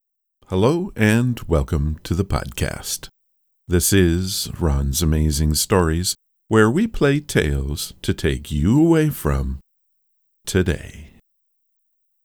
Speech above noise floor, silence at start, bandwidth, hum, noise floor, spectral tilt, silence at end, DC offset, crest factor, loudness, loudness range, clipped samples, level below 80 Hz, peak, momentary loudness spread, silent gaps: 50 dB; 0.5 s; 19.5 kHz; none; -69 dBFS; -5 dB/octave; 1.2 s; under 0.1%; 20 dB; -20 LUFS; 3 LU; under 0.1%; -30 dBFS; -2 dBFS; 10 LU; none